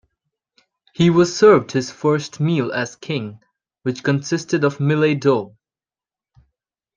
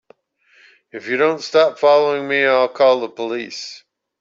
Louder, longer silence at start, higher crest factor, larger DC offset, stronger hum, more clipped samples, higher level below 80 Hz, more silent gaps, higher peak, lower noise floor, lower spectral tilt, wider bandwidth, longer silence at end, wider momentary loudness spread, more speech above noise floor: about the same, -18 LUFS vs -16 LUFS; about the same, 1 s vs 0.95 s; about the same, 18 dB vs 16 dB; neither; neither; neither; first, -60 dBFS vs -70 dBFS; neither; about the same, -2 dBFS vs -2 dBFS; first, under -90 dBFS vs -56 dBFS; first, -6 dB/octave vs -4 dB/octave; first, 9.4 kHz vs 7.6 kHz; first, 1.5 s vs 0.45 s; second, 13 LU vs 16 LU; first, over 72 dB vs 39 dB